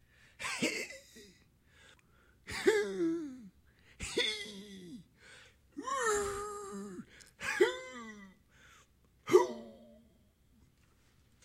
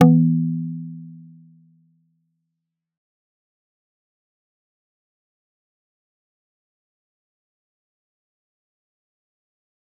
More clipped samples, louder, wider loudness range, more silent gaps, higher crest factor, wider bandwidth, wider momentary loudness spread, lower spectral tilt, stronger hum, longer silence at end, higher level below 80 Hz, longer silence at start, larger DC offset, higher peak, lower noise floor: neither; second, -34 LUFS vs -20 LUFS; second, 4 LU vs 23 LU; neither; about the same, 26 dB vs 26 dB; first, 16 kHz vs 2.9 kHz; about the same, 24 LU vs 24 LU; second, -3 dB/octave vs -10 dB/octave; neither; second, 1.5 s vs 8.85 s; first, -64 dBFS vs -74 dBFS; first, 0.4 s vs 0 s; neither; second, -12 dBFS vs -2 dBFS; second, -68 dBFS vs -81 dBFS